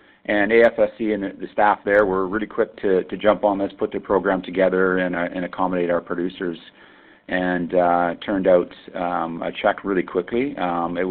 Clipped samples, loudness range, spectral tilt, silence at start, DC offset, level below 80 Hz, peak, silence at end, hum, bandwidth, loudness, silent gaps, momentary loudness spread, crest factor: under 0.1%; 3 LU; -9 dB/octave; 0.3 s; under 0.1%; -52 dBFS; -4 dBFS; 0 s; none; 4.5 kHz; -21 LUFS; none; 9 LU; 18 dB